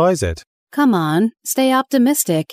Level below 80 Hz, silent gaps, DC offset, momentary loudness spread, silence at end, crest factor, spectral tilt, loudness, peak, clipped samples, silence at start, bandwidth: -42 dBFS; 0.47-0.67 s; under 0.1%; 9 LU; 0 s; 14 dB; -5 dB/octave; -17 LUFS; -2 dBFS; under 0.1%; 0 s; 16 kHz